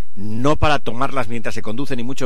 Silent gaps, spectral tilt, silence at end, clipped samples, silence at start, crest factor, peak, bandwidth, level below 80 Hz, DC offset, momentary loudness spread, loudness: none; -5.5 dB/octave; 0 s; under 0.1%; 0.15 s; 18 dB; -2 dBFS; 15 kHz; -34 dBFS; 20%; 9 LU; -22 LUFS